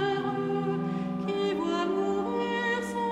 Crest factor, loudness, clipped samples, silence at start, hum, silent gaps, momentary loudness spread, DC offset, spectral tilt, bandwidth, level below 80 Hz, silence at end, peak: 12 dB; -29 LUFS; under 0.1%; 0 s; none; none; 3 LU; under 0.1%; -6 dB/octave; 12.5 kHz; -62 dBFS; 0 s; -18 dBFS